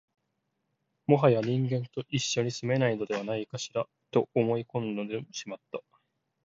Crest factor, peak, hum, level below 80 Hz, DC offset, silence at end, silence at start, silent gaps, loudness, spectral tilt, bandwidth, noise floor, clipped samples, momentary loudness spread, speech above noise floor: 22 dB; -8 dBFS; none; -72 dBFS; under 0.1%; 0.65 s; 1.1 s; none; -29 LUFS; -5.5 dB/octave; 7.8 kHz; -80 dBFS; under 0.1%; 15 LU; 51 dB